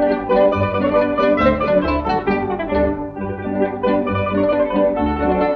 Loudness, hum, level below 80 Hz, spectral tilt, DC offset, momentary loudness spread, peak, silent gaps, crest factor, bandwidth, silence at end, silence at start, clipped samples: -18 LUFS; none; -36 dBFS; -9 dB/octave; under 0.1%; 6 LU; -4 dBFS; none; 14 dB; 5.8 kHz; 0 s; 0 s; under 0.1%